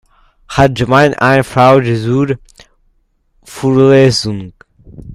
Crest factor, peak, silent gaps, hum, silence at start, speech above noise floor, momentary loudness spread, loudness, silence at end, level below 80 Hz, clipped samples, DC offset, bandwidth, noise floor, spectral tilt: 12 dB; 0 dBFS; none; none; 0.5 s; 46 dB; 13 LU; -11 LUFS; 0 s; -38 dBFS; 0.1%; under 0.1%; 14 kHz; -57 dBFS; -6 dB/octave